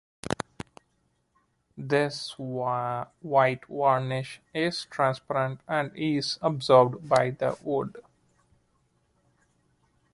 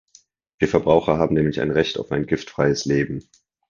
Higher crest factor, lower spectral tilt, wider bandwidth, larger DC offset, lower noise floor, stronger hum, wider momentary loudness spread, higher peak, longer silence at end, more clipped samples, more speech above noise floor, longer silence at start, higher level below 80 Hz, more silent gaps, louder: about the same, 24 dB vs 20 dB; about the same, -5.5 dB/octave vs -6 dB/octave; first, 11.5 kHz vs 7.4 kHz; neither; first, -72 dBFS vs -56 dBFS; neither; first, 13 LU vs 8 LU; second, -6 dBFS vs -2 dBFS; first, 2.15 s vs 0.5 s; neither; first, 46 dB vs 36 dB; second, 0.25 s vs 0.6 s; second, -64 dBFS vs -46 dBFS; neither; second, -27 LUFS vs -21 LUFS